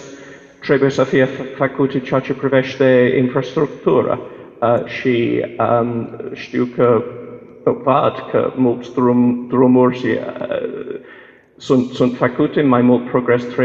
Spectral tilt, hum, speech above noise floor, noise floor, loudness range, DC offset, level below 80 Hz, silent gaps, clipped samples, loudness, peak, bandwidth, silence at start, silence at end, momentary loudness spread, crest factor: -7.5 dB/octave; none; 27 dB; -43 dBFS; 2 LU; under 0.1%; -56 dBFS; none; under 0.1%; -16 LUFS; 0 dBFS; 7.4 kHz; 0 s; 0 s; 12 LU; 16 dB